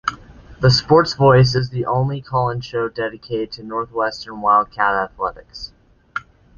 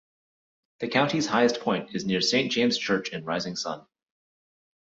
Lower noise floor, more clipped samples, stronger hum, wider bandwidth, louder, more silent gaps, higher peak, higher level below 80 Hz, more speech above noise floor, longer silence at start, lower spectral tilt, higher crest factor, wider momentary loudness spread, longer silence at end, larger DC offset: second, -40 dBFS vs under -90 dBFS; neither; neither; about the same, 7.2 kHz vs 7.8 kHz; first, -18 LUFS vs -26 LUFS; neither; first, 0 dBFS vs -8 dBFS; first, -44 dBFS vs -68 dBFS; second, 22 dB vs over 64 dB; second, 0.05 s vs 0.8 s; first, -6 dB/octave vs -4 dB/octave; about the same, 18 dB vs 20 dB; first, 18 LU vs 9 LU; second, 0.4 s vs 1.05 s; neither